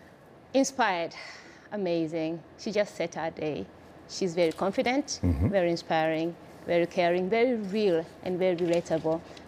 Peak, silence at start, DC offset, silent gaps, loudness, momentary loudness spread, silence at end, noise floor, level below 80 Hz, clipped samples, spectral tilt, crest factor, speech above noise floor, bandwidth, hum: -14 dBFS; 0.5 s; under 0.1%; none; -28 LUFS; 11 LU; 0 s; -53 dBFS; -50 dBFS; under 0.1%; -5.5 dB/octave; 16 dB; 25 dB; 15 kHz; none